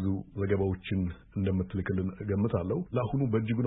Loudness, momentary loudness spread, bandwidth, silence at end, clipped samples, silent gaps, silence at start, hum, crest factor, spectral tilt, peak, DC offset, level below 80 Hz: -31 LUFS; 4 LU; 4 kHz; 0 s; under 0.1%; none; 0 s; none; 14 dB; -12 dB/octave; -16 dBFS; under 0.1%; -52 dBFS